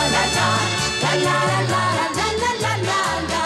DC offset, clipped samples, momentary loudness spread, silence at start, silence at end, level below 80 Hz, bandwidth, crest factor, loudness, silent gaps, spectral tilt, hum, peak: under 0.1%; under 0.1%; 3 LU; 0 s; 0 s; -42 dBFS; 15 kHz; 10 dB; -19 LUFS; none; -3.5 dB/octave; none; -10 dBFS